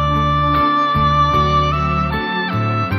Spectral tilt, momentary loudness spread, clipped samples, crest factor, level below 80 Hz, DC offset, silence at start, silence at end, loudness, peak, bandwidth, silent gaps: -7 dB/octave; 5 LU; under 0.1%; 12 dB; -28 dBFS; under 0.1%; 0 s; 0 s; -16 LUFS; -4 dBFS; 13 kHz; none